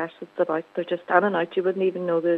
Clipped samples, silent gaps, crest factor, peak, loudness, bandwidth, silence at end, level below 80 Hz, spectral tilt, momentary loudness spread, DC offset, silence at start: under 0.1%; none; 20 dB; -2 dBFS; -24 LUFS; 4.7 kHz; 0 s; -84 dBFS; -8.5 dB/octave; 8 LU; under 0.1%; 0 s